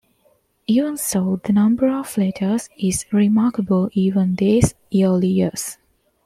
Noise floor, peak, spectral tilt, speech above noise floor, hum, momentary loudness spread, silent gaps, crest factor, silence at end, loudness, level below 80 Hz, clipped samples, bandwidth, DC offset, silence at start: -61 dBFS; -2 dBFS; -6.5 dB/octave; 43 dB; none; 6 LU; none; 16 dB; 0.55 s; -19 LUFS; -46 dBFS; under 0.1%; 15.5 kHz; under 0.1%; 0.7 s